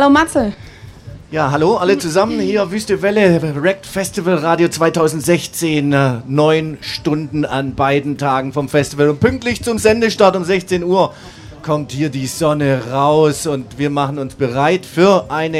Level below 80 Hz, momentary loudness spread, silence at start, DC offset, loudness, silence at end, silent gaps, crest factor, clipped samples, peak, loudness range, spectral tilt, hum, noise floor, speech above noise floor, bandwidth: -42 dBFS; 8 LU; 0 s; under 0.1%; -15 LUFS; 0 s; none; 14 dB; under 0.1%; 0 dBFS; 2 LU; -5.5 dB/octave; none; -34 dBFS; 20 dB; 16 kHz